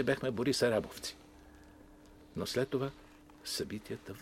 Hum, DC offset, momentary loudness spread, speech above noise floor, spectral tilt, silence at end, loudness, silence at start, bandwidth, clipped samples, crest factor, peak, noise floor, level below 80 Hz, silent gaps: none; under 0.1%; 16 LU; 22 dB; -4.5 dB/octave; 0 s; -35 LUFS; 0 s; 16 kHz; under 0.1%; 20 dB; -18 dBFS; -57 dBFS; -62 dBFS; none